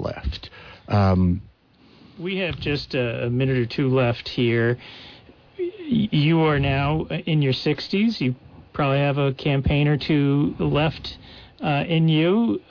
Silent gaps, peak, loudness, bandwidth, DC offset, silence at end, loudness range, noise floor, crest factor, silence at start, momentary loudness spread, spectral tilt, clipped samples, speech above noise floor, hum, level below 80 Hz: none; -10 dBFS; -22 LUFS; 5.4 kHz; under 0.1%; 0.1 s; 2 LU; -54 dBFS; 12 dB; 0 s; 13 LU; -8.5 dB/octave; under 0.1%; 33 dB; none; -42 dBFS